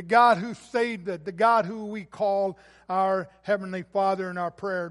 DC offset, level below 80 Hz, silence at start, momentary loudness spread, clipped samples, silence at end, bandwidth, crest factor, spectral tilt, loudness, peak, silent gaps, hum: under 0.1%; -68 dBFS; 0 s; 11 LU; under 0.1%; 0 s; 11.5 kHz; 20 dB; -6 dB/octave; -26 LUFS; -6 dBFS; none; none